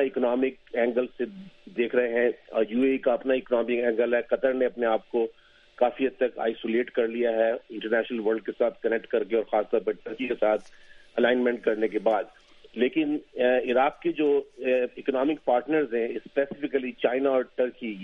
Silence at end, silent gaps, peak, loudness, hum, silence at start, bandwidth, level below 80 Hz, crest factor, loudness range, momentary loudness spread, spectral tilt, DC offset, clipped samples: 0 s; none; -8 dBFS; -26 LUFS; none; 0 s; 6 kHz; -64 dBFS; 18 dB; 2 LU; 5 LU; -7 dB/octave; under 0.1%; under 0.1%